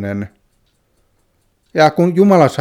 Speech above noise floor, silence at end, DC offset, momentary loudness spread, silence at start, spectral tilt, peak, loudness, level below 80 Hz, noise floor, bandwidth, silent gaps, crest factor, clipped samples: 48 dB; 0 s; under 0.1%; 15 LU; 0 s; -7 dB/octave; 0 dBFS; -13 LUFS; -56 dBFS; -61 dBFS; 15 kHz; none; 16 dB; under 0.1%